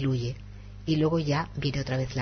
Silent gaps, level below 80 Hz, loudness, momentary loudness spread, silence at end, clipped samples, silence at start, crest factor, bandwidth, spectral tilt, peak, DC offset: none; -46 dBFS; -29 LUFS; 14 LU; 0 s; under 0.1%; 0 s; 12 dB; 6.6 kHz; -7 dB/octave; -16 dBFS; under 0.1%